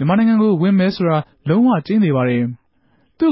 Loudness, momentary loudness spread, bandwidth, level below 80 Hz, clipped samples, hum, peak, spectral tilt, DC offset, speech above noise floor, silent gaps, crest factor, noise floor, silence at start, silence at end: -16 LUFS; 6 LU; 5.8 kHz; -56 dBFS; under 0.1%; none; -6 dBFS; -12.5 dB/octave; under 0.1%; 45 dB; none; 10 dB; -60 dBFS; 0 s; 0 s